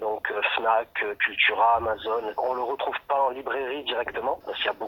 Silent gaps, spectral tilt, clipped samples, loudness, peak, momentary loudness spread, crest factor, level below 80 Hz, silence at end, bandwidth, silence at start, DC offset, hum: none; -4.5 dB/octave; under 0.1%; -25 LUFS; -8 dBFS; 8 LU; 18 dB; -58 dBFS; 0 s; 18 kHz; 0 s; under 0.1%; none